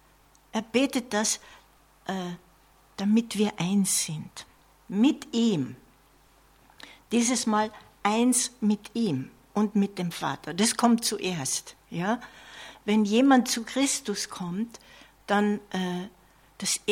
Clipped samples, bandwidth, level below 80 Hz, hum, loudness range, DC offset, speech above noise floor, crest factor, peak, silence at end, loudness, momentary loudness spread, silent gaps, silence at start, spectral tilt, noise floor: under 0.1%; 16.5 kHz; -64 dBFS; none; 3 LU; under 0.1%; 33 dB; 20 dB; -8 dBFS; 0 s; -27 LUFS; 14 LU; none; 0.55 s; -4 dB/octave; -60 dBFS